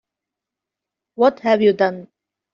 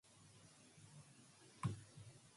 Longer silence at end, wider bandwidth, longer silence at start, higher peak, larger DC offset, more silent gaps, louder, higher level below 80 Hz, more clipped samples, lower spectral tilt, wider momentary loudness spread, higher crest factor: first, 0.5 s vs 0 s; second, 7 kHz vs 11.5 kHz; first, 1.2 s vs 0.05 s; first, -4 dBFS vs -30 dBFS; neither; neither; first, -17 LUFS vs -53 LUFS; first, -66 dBFS vs -74 dBFS; neither; second, -4 dB/octave vs -5.5 dB/octave; second, 6 LU vs 17 LU; second, 18 dB vs 24 dB